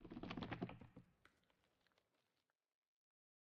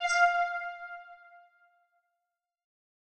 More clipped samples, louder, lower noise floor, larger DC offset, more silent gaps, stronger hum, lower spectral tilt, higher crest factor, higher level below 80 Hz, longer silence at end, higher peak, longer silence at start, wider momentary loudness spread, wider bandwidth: neither; second, -52 LUFS vs -28 LUFS; about the same, under -90 dBFS vs -87 dBFS; neither; neither; neither; first, -5 dB/octave vs 3 dB/octave; first, 26 dB vs 20 dB; about the same, -74 dBFS vs -76 dBFS; first, 2.25 s vs 2 s; second, -32 dBFS vs -14 dBFS; about the same, 0 s vs 0 s; second, 16 LU vs 22 LU; second, 6.4 kHz vs 9.6 kHz